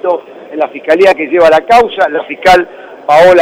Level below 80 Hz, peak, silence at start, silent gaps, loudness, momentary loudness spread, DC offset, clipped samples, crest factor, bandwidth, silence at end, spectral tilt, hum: -40 dBFS; 0 dBFS; 0.05 s; none; -9 LUFS; 12 LU; under 0.1%; under 0.1%; 8 dB; 15.5 kHz; 0 s; -4.5 dB/octave; none